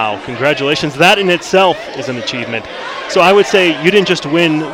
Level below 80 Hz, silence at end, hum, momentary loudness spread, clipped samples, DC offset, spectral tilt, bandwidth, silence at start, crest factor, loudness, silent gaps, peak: -50 dBFS; 0 s; none; 12 LU; under 0.1%; under 0.1%; -4.5 dB/octave; 17 kHz; 0 s; 12 dB; -12 LUFS; none; 0 dBFS